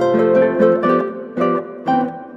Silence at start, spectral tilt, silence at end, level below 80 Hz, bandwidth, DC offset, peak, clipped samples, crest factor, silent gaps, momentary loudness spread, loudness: 0 s; -8 dB/octave; 0 s; -62 dBFS; 7.2 kHz; under 0.1%; -2 dBFS; under 0.1%; 14 dB; none; 7 LU; -17 LUFS